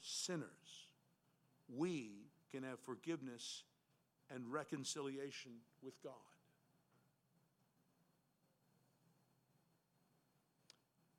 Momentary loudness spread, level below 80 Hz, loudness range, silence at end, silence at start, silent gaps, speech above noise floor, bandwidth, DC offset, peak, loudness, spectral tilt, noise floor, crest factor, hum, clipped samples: 16 LU; under -90 dBFS; 14 LU; 4.85 s; 0 s; none; 33 dB; 16.5 kHz; under 0.1%; -32 dBFS; -49 LUFS; -3.5 dB/octave; -82 dBFS; 22 dB; none; under 0.1%